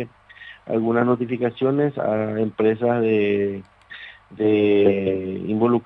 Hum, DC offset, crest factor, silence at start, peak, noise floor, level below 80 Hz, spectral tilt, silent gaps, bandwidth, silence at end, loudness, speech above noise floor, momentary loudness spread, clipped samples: none; under 0.1%; 16 dB; 0 s; -4 dBFS; -44 dBFS; -62 dBFS; -10 dB/octave; none; 4.2 kHz; 0.05 s; -21 LUFS; 24 dB; 21 LU; under 0.1%